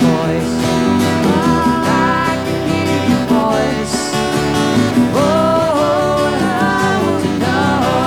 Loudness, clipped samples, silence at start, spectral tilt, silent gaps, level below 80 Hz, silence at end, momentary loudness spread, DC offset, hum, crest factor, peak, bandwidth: -14 LUFS; under 0.1%; 0 s; -5.5 dB/octave; none; -38 dBFS; 0 s; 3 LU; 0.4%; none; 12 dB; -2 dBFS; 17.5 kHz